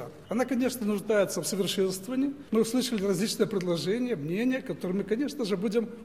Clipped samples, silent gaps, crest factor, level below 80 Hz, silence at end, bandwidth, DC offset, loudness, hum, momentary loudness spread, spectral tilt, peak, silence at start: under 0.1%; none; 16 dB; -64 dBFS; 0 s; 16 kHz; 0.1%; -29 LUFS; none; 4 LU; -5 dB/octave; -12 dBFS; 0 s